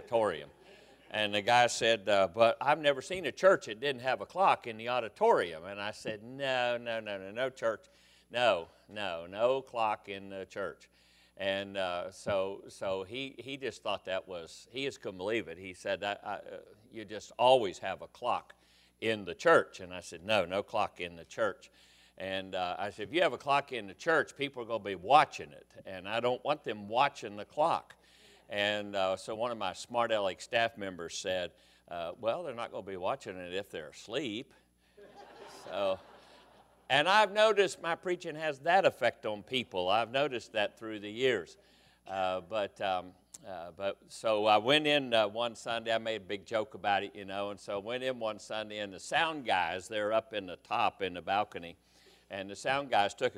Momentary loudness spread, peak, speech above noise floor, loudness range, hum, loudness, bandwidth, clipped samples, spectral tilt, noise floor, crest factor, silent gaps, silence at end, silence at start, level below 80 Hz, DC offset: 16 LU; -10 dBFS; 29 dB; 8 LU; none; -32 LUFS; 14.5 kHz; under 0.1%; -3.5 dB/octave; -62 dBFS; 24 dB; none; 0 s; 0 s; -72 dBFS; under 0.1%